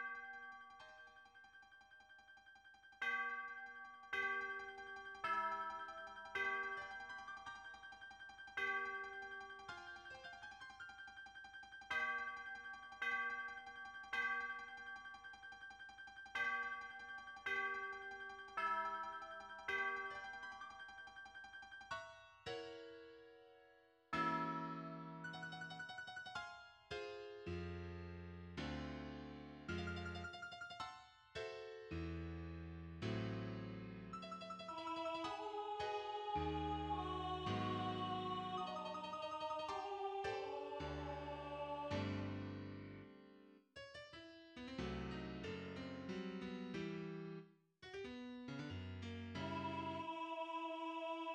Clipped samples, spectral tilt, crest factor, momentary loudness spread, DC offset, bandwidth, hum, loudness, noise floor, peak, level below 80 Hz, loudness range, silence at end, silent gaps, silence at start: under 0.1%; -5.5 dB/octave; 18 dB; 14 LU; under 0.1%; 14 kHz; none; -47 LUFS; -70 dBFS; -30 dBFS; -66 dBFS; 6 LU; 0 s; none; 0 s